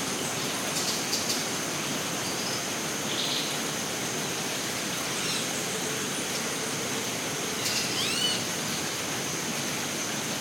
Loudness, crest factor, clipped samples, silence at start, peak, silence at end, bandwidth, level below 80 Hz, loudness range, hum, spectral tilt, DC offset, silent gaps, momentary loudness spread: -28 LUFS; 16 dB; under 0.1%; 0 s; -14 dBFS; 0 s; 18 kHz; -64 dBFS; 1 LU; none; -1.5 dB/octave; under 0.1%; none; 3 LU